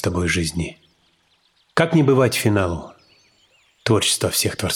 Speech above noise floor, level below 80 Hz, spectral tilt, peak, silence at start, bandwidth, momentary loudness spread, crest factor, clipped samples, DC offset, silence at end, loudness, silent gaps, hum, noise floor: 43 dB; -44 dBFS; -4.5 dB/octave; -2 dBFS; 0 s; 18.5 kHz; 13 LU; 20 dB; under 0.1%; under 0.1%; 0 s; -19 LUFS; none; none; -62 dBFS